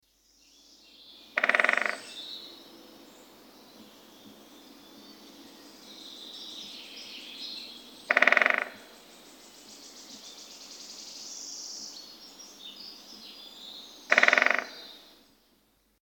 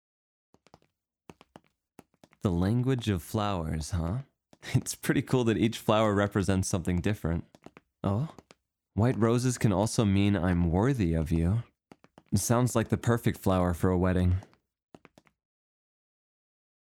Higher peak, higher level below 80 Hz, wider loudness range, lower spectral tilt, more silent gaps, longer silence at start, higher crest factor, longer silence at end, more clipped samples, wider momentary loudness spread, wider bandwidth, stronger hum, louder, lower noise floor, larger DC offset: first, -2 dBFS vs -10 dBFS; second, -78 dBFS vs -48 dBFS; first, 19 LU vs 5 LU; second, 0 dB/octave vs -6 dB/octave; neither; second, 1.35 s vs 2.45 s; first, 30 dB vs 18 dB; second, 1.05 s vs 2.4 s; neither; first, 28 LU vs 7 LU; first, over 20 kHz vs 17.5 kHz; neither; about the same, -27 LUFS vs -28 LUFS; second, -68 dBFS vs -75 dBFS; neither